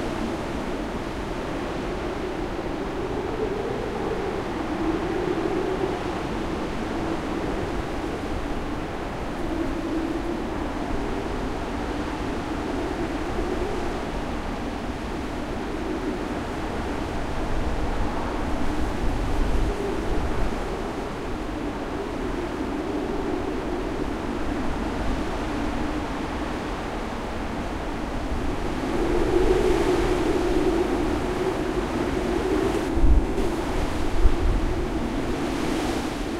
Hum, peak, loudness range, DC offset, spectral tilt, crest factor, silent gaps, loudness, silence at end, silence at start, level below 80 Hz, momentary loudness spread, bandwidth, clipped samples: none; -4 dBFS; 5 LU; under 0.1%; -6 dB/octave; 22 dB; none; -27 LUFS; 0 s; 0 s; -30 dBFS; 7 LU; 14.5 kHz; under 0.1%